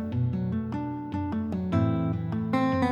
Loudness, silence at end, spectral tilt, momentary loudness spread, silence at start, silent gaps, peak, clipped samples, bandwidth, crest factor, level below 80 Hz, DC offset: -29 LUFS; 0 s; -9 dB/octave; 7 LU; 0 s; none; -12 dBFS; under 0.1%; 8.4 kHz; 14 dB; -52 dBFS; under 0.1%